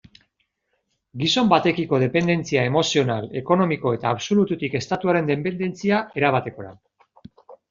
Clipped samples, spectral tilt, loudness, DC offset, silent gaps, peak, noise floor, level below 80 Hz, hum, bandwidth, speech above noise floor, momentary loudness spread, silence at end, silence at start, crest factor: under 0.1%; -5.5 dB/octave; -21 LUFS; under 0.1%; none; -2 dBFS; -73 dBFS; -58 dBFS; none; 7.6 kHz; 52 dB; 7 LU; 0.15 s; 1.15 s; 20 dB